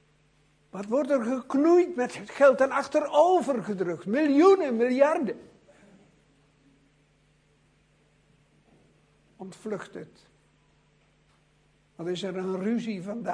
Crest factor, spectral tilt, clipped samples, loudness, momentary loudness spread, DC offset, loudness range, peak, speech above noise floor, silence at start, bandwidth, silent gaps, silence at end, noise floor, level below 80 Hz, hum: 20 dB; -6 dB/octave; under 0.1%; -25 LUFS; 20 LU; under 0.1%; 21 LU; -8 dBFS; 40 dB; 0.75 s; 10.5 kHz; none; 0 s; -65 dBFS; -72 dBFS; none